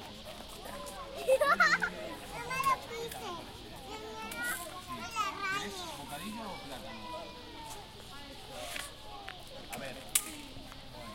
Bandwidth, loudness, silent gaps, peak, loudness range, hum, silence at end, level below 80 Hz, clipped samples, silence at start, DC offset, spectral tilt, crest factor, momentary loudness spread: 16.5 kHz; -35 LUFS; none; -10 dBFS; 12 LU; none; 0 s; -58 dBFS; under 0.1%; 0 s; under 0.1%; -2 dB/octave; 28 dB; 17 LU